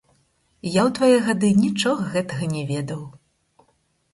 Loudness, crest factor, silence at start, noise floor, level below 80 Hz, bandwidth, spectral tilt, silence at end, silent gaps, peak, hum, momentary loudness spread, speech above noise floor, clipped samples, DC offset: -21 LUFS; 18 dB; 0.65 s; -66 dBFS; -58 dBFS; 11.5 kHz; -5.5 dB/octave; 1.05 s; none; -4 dBFS; none; 15 LU; 46 dB; under 0.1%; under 0.1%